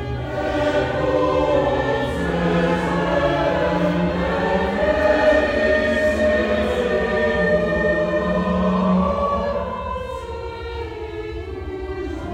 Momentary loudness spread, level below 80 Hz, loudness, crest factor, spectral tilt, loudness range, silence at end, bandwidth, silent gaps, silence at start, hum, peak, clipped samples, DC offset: 12 LU; -34 dBFS; -20 LUFS; 14 dB; -7 dB/octave; 5 LU; 0 s; 10.5 kHz; none; 0 s; none; -6 dBFS; under 0.1%; under 0.1%